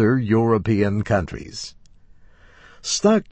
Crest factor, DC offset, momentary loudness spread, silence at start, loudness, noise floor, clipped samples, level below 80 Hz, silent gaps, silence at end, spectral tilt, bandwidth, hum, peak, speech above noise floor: 16 dB; under 0.1%; 15 LU; 0 s; -20 LUFS; -48 dBFS; under 0.1%; -46 dBFS; none; 0.1 s; -5.5 dB/octave; 8.6 kHz; none; -4 dBFS; 29 dB